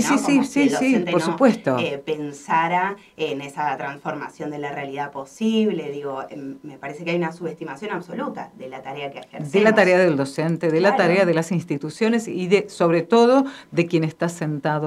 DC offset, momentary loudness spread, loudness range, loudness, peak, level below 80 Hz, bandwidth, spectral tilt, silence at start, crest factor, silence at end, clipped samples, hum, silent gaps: under 0.1%; 15 LU; 8 LU; -21 LUFS; -2 dBFS; -66 dBFS; 13.5 kHz; -5.5 dB/octave; 0 s; 18 dB; 0 s; under 0.1%; none; none